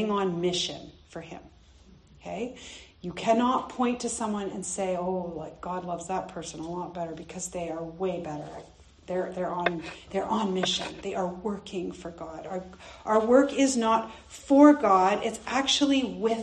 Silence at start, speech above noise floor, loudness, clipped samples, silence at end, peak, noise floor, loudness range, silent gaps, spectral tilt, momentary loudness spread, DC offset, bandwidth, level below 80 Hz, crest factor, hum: 0 s; 27 dB; -27 LUFS; under 0.1%; 0 s; -4 dBFS; -55 dBFS; 11 LU; none; -4 dB/octave; 19 LU; under 0.1%; 10 kHz; -58 dBFS; 24 dB; none